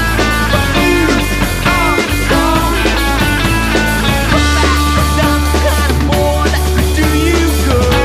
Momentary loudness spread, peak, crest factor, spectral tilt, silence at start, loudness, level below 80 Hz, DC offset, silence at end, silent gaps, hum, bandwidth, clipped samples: 2 LU; 0 dBFS; 12 dB; -4.5 dB/octave; 0 s; -12 LUFS; -16 dBFS; under 0.1%; 0 s; none; none; 15.5 kHz; under 0.1%